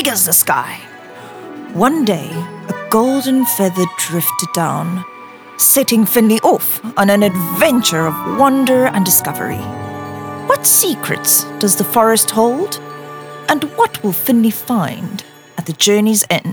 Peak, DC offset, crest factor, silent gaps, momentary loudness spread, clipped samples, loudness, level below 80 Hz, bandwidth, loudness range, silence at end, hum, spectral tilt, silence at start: 0 dBFS; under 0.1%; 14 dB; none; 16 LU; under 0.1%; -13 LUFS; -56 dBFS; over 20 kHz; 4 LU; 0 s; none; -3.5 dB/octave; 0 s